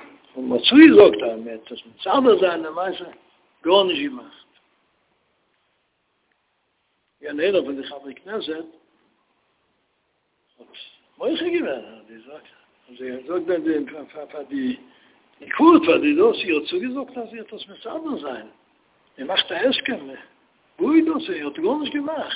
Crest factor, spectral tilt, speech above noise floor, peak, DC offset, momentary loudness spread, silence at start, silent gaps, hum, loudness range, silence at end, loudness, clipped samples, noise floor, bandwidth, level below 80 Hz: 22 dB; -8.5 dB/octave; 50 dB; 0 dBFS; under 0.1%; 21 LU; 0 s; none; none; 11 LU; 0 s; -19 LUFS; under 0.1%; -70 dBFS; 4 kHz; -64 dBFS